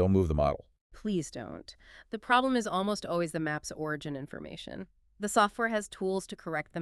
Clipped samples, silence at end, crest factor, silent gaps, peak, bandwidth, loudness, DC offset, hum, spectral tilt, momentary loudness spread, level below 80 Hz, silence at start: under 0.1%; 0 s; 22 dB; 0.81-0.90 s; -10 dBFS; 13.5 kHz; -31 LUFS; under 0.1%; none; -5 dB/octave; 16 LU; -48 dBFS; 0 s